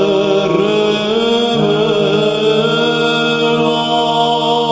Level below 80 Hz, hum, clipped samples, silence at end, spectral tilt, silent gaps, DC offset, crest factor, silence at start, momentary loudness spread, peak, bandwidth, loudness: -50 dBFS; none; under 0.1%; 0 s; -5 dB/octave; none; under 0.1%; 12 dB; 0 s; 1 LU; 0 dBFS; 8 kHz; -13 LUFS